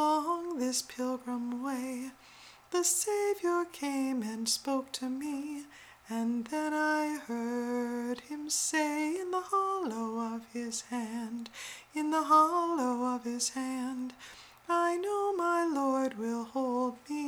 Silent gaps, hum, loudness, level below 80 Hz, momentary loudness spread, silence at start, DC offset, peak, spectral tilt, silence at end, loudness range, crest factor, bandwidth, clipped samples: none; none; -32 LUFS; -76 dBFS; 11 LU; 0 s; under 0.1%; -14 dBFS; -2.5 dB/octave; 0 s; 3 LU; 18 dB; over 20 kHz; under 0.1%